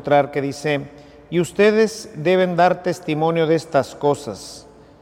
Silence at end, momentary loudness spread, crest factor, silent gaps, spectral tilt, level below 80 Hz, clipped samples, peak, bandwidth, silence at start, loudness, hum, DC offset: 0.4 s; 14 LU; 16 dB; none; -6 dB/octave; -56 dBFS; under 0.1%; -4 dBFS; 15.5 kHz; 0.05 s; -19 LUFS; none; under 0.1%